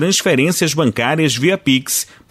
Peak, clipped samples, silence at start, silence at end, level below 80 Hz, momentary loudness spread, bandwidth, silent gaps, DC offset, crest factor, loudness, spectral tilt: -2 dBFS; under 0.1%; 0 s; 0.25 s; -54 dBFS; 2 LU; 16 kHz; none; under 0.1%; 12 dB; -15 LUFS; -3.5 dB/octave